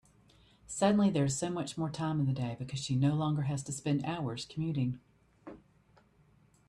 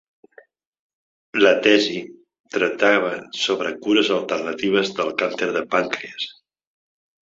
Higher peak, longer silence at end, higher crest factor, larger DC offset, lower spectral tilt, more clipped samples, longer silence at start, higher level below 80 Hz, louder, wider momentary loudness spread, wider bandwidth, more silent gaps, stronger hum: second, -14 dBFS vs -2 dBFS; first, 1.1 s vs 0.9 s; about the same, 20 dB vs 20 dB; neither; first, -6 dB/octave vs -3.5 dB/octave; neither; second, 0.7 s vs 1.35 s; about the same, -64 dBFS vs -66 dBFS; second, -33 LUFS vs -20 LUFS; about the same, 11 LU vs 13 LU; first, 12 kHz vs 7.8 kHz; second, none vs 2.40-2.44 s; neither